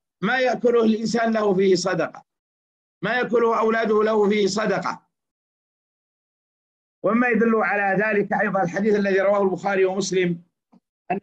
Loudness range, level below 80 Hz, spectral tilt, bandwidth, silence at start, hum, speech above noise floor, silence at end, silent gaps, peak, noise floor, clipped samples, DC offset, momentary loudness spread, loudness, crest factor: 4 LU; -66 dBFS; -5.5 dB/octave; 9 kHz; 0.2 s; none; over 70 dB; 0.05 s; 2.39-3.01 s, 5.31-7.02 s, 10.89-11.05 s; -10 dBFS; under -90 dBFS; under 0.1%; under 0.1%; 7 LU; -21 LUFS; 12 dB